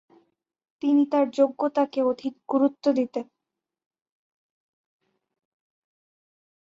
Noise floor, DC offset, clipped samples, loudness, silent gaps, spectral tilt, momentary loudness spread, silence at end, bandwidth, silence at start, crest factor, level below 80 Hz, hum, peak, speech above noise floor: -87 dBFS; under 0.1%; under 0.1%; -24 LUFS; none; -6 dB/octave; 10 LU; 3.45 s; 7.4 kHz; 0.85 s; 18 dB; -76 dBFS; none; -10 dBFS; 63 dB